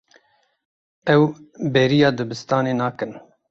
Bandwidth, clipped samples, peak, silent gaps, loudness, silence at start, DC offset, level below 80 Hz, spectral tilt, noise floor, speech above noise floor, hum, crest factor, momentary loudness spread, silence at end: 7.6 kHz; under 0.1%; -2 dBFS; none; -20 LUFS; 1.05 s; under 0.1%; -60 dBFS; -6.5 dB/octave; -60 dBFS; 40 dB; none; 18 dB; 12 LU; 0.3 s